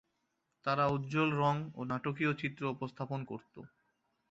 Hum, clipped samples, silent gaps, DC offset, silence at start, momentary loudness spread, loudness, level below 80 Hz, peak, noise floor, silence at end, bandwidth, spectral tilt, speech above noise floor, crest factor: none; under 0.1%; none; under 0.1%; 0.65 s; 14 LU; -35 LUFS; -70 dBFS; -18 dBFS; -82 dBFS; 0.65 s; 7.8 kHz; -5.5 dB/octave; 47 dB; 18 dB